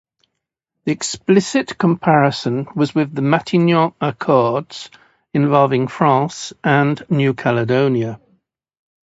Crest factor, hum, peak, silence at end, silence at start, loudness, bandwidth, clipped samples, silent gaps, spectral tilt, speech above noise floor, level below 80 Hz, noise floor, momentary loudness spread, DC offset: 18 dB; none; 0 dBFS; 1 s; 0.85 s; -17 LUFS; 8 kHz; under 0.1%; none; -6 dB/octave; 61 dB; -60 dBFS; -78 dBFS; 10 LU; under 0.1%